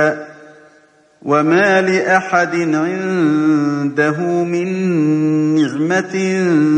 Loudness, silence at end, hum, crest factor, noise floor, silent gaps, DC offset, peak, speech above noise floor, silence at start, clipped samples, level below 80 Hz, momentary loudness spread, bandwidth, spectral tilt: -15 LUFS; 0 s; none; 14 dB; -50 dBFS; none; under 0.1%; 0 dBFS; 36 dB; 0 s; under 0.1%; -66 dBFS; 5 LU; 9.2 kHz; -6.5 dB/octave